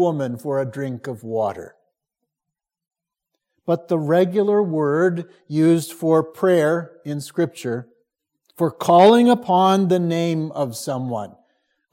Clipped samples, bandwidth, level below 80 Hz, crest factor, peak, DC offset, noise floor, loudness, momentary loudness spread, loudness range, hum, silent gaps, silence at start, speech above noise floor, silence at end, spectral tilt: under 0.1%; 16.5 kHz; -72 dBFS; 18 dB; -2 dBFS; under 0.1%; -85 dBFS; -19 LUFS; 13 LU; 11 LU; none; none; 0 s; 66 dB; 0.65 s; -6.5 dB/octave